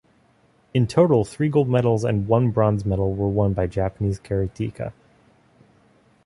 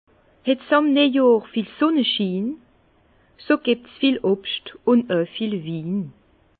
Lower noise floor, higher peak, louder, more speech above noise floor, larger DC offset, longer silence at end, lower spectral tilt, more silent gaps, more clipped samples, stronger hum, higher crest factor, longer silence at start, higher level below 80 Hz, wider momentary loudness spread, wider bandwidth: about the same, -59 dBFS vs -58 dBFS; about the same, -4 dBFS vs -4 dBFS; about the same, -22 LUFS vs -21 LUFS; about the same, 39 dB vs 38 dB; neither; first, 1.35 s vs 0.5 s; second, -8.5 dB/octave vs -10.5 dB/octave; neither; neither; neither; about the same, 18 dB vs 18 dB; first, 0.75 s vs 0.45 s; first, -42 dBFS vs -64 dBFS; about the same, 9 LU vs 11 LU; first, 11.5 kHz vs 4.7 kHz